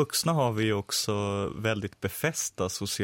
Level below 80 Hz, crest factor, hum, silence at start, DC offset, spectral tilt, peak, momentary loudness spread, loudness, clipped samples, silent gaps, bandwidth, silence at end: -58 dBFS; 16 dB; none; 0 s; under 0.1%; -4 dB/octave; -12 dBFS; 5 LU; -29 LUFS; under 0.1%; none; 17 kHz; 0 s